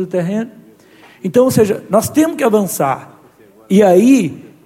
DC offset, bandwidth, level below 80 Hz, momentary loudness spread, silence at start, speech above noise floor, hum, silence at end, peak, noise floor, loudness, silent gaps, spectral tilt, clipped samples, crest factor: under 0.1%; 17 kHz; -54 dBFS; 13 LU; 0 s; 33 dB; none; 0.2 s; 0 dBFS; -45 dBFS; -13 LUFS; none; -6 dB/octave; under 0.1%; 14 dB